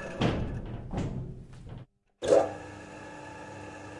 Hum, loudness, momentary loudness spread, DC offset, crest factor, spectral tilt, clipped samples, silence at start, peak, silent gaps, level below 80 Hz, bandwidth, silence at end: none; -31 LUFS; 21 LU; under 0.1%; 22 dB; -6.5 dB/octave; under 0.1%; 0 s; -10 dBFS; none; -46 dBFS; 11.5 kHz; 0 s